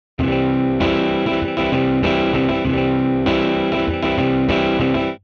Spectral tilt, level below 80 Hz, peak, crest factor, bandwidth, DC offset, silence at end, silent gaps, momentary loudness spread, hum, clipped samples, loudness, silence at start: -7.5 dB/octave; -36 dBFS; -4 dBFS; 14 dB; 6.6 kHz; under 0.1%; 0.05 s; none; 2 LU; none; under 0.1%; -18 LUFS; 0.2 s